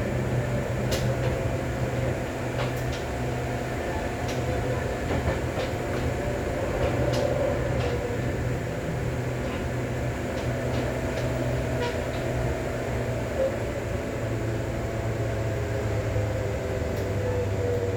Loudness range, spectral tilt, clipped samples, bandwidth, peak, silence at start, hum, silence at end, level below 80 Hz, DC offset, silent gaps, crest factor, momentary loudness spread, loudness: 2 LU; -6.5 dB/octave; under 0.1%; 19.5 kHz; -12 dBFS; 0 s; none; 0 s; -38 dBFS; under 0.1%; none; 16 dB; 3 LU; -28 LUFS